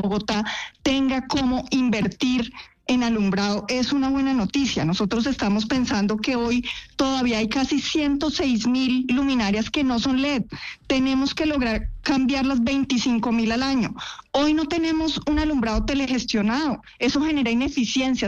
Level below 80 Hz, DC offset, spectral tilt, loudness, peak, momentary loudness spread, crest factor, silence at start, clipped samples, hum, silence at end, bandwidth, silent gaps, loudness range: -40 dBFS; under 0.1%; -4.5 dB/octave; -22 LUFS; -10 dBFS; 4 LU; 12 dB; 0 s; under 0.1%; none; 0 s; 8.2 kHz; none; 1 LU